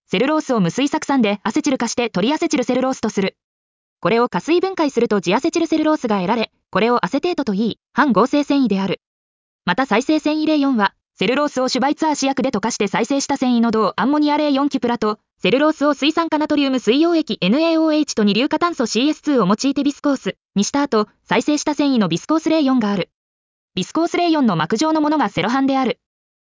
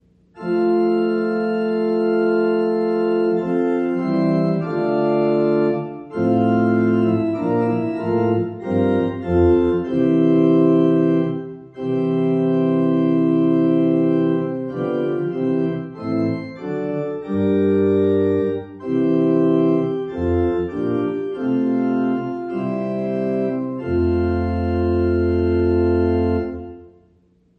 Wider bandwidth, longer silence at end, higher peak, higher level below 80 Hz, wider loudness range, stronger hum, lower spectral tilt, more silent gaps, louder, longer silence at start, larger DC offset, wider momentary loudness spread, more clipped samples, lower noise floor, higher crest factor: first, 7.6 kHz vs 5 kHz; about the same, 0.65 s vs 0.7 s; about the same, -4 dBFS vs -4 dBFS; second, -58 dBFS vs -42 dBFS; about the same, 2 LU vs 4 LU; neither; second, -5 dB/octave vs -10 dB/octave; first, 3.44-3.96 s, 9.06-9.59 s, 20.45-20.49 s, 23.14-23.68 s vs none; about the same, -18 LUFS vs -19 LUFS; second, 0.1 s vs 0.35 s; neither; second, 5 LU vs 8 LU; neither; first, under -90 dBFS vs -57 dBFS; about the same, 14 dB vs 14 dB